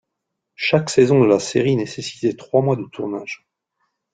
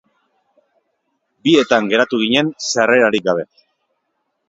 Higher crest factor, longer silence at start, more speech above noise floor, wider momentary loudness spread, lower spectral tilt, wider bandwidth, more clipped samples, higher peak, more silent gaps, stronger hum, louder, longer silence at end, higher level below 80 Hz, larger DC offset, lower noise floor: about the same, 18 dB vs 18 dB; second, 0.6 s vs 1.45 s; first, 61 dB vs 56 dB; first, 13 LU vs 9 LU; first, -6 dB/octave vs -3.5 dB/octave; first, 9.4 kHz vs 7.8 kHz; neither; about the same, -2 dBFS vs 0 dBFS; neither; neither; second, -19 LUFS vs -15 LUFS; second, 0.8 s vs 1.05 s; about the same, -58 dBFS vs -62 dBFS; neither; first, -79 dBFS vs -71 dBFS